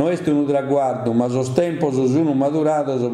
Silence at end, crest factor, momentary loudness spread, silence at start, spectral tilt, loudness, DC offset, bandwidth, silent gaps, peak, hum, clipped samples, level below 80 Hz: 0 s; 16 dB; 2 LU; 0 s; -7.5 dB/octave; -19 LUFS; under 0.1%; 11.5 kHz; none; -2 dBFS; none; under 0.1%; -60 dBFS